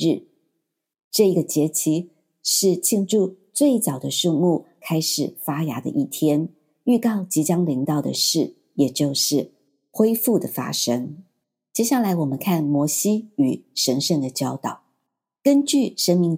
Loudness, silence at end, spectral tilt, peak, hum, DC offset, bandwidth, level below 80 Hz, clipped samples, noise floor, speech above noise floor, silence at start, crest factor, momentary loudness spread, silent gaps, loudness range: -21 LUFS; 0 s; -4.5 dB/octave; -4 dBFS; none; under 0.1%; 16.5 kHz; -76 dBFS; under 0.1%; -78 dBFS; 57 dB; 0 s; 18 dB; 8 LU; 1.04-1.11 s; 2 LU